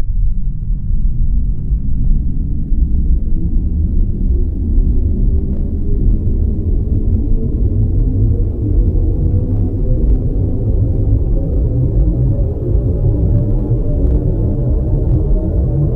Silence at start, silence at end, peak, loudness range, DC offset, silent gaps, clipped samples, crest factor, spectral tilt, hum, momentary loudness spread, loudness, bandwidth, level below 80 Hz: 0 s; 0 s; -2 dBFS; 3 LU; under 0.1%; none; under 0.1%; 12 dB; -13.5 dB/octave; none; 5 LU; -17 LUFS; 1.3 kHz; -14 dBFS